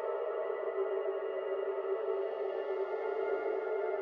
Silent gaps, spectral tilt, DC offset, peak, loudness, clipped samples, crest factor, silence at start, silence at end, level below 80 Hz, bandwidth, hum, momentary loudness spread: none; -6 dB/octave; under 0.1%; -24 dBFS; -36 LUFS; under 0.1%; 12 dB; 0 s; 0 s; -84 dBFS; 5 kHz; none; 2 LU